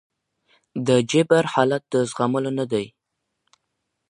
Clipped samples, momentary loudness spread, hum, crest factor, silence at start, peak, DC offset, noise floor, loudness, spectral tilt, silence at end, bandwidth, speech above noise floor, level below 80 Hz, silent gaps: under 0.1%; 10 LU; none; 22 dB; 0.75 s; -2 dBFS; under 0.1%; -77 dBFS; -21 LUFS; -5.5 dB/octave; 1.2 s; 10.5 kHz; 57 dB; -66 dBFS; none